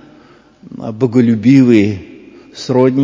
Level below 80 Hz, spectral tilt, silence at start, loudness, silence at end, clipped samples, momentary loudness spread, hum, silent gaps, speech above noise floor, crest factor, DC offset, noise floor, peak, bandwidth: -48 dBFS; -8 dB/octave; 0.75 s; -11 LUFS; 0 s; 0.3%; 19 LU; none; none; 34 dB; 12 dB; under 0.1%; -44 dBFS; 0 dBFS; 7.6 kHz